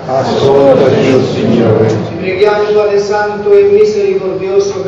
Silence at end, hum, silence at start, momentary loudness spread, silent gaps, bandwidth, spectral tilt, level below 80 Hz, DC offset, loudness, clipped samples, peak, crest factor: 0 s; none; 0 s; 6 LU; none; 7.6 kHz; -6.5 dB/octave; -44 dBFS; under 0.1%; -10 LUFS; 1%; 0 dBFS; 10 dB